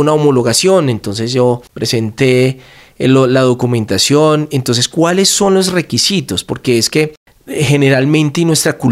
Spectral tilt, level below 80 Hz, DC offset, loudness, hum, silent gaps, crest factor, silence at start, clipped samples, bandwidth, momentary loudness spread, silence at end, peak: -4.5 dB/octave; -48 dBFS; under 0.1%; -12 LUFS; none; 7.17-7.26 s; 12 dB; 0 s; under 0.1%; 16 kHz; 7 LU; 0 s; 0 dBFS